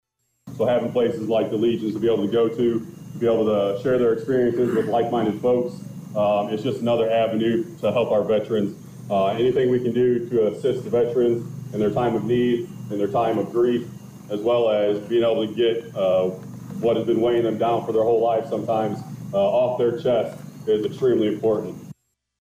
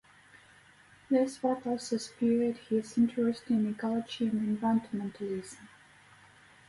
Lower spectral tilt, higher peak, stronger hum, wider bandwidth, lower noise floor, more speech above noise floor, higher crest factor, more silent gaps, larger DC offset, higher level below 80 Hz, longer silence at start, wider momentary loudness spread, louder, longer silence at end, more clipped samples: first, -7.5 dB/octave vs -6 dB/octave; first, -12 dBFS vs -16 dBFS; neither; first, 15.5 kHz vs 11.5 kHz; second, -47 dBFS vs -59 dBFS; about the same, 26 dB vs 29 dB; second, 10 dB vs 16 dB; neither; neither; first, -58 dBFS vs -70 dBFS; second, 0.45 s vs 1.1 s; about the same, 7 LU vs 9 LU; first, -22 LUFS vs -31 LUFS; second, 0.5 s vs 1 s; neither